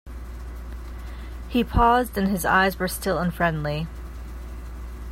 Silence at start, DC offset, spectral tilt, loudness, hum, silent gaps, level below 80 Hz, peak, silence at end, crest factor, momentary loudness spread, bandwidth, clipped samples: 0.05 s; under 0.1%; -5.5 dB/octave; -23 LUFS; none; none; -34 dBFS; -6 dBFS; 0 s; 20 dB; 19 LU; 16 kHz; under 0.1%